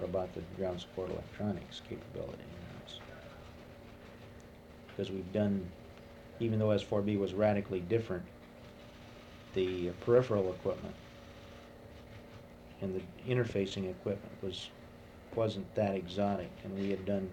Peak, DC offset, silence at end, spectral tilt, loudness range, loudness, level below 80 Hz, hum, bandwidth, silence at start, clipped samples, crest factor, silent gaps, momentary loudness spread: -14 dBFS; under 0.1%; 0 s; -7.5 dB/octave; 9 LU; -36 LUFS; -60 dBFS; none; 18 kHz; 0 s; under 0.1%; 22 dB; none; 21 LU